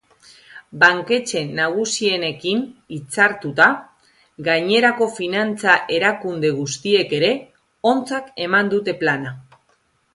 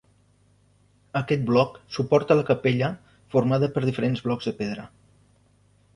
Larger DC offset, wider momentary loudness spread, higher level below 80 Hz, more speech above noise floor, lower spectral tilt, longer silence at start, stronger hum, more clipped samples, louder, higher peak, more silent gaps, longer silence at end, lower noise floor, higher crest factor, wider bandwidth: neither; about the same, 11 LU vs 11 LU; second, -64 dBFS vs -58 dBFS; first, 44 dB vs 38 dB; second, -3.5 dB/octave vs -7.5 dB/octave; second, 0.5 s vs 1.15 s; second, none vs 50 Hz at -50 dBFS; neither; first, -18 LUFS vs -24 LUFS; first, 0 dBFS vs -6 dBFS; neither; second, 0.75 s vs 1.1 s; about the same, -63 dBFS vs -61 dBFS; about the same, 20 dB vs 20 dB; about the same, 11.5 kHz vs 11 kHz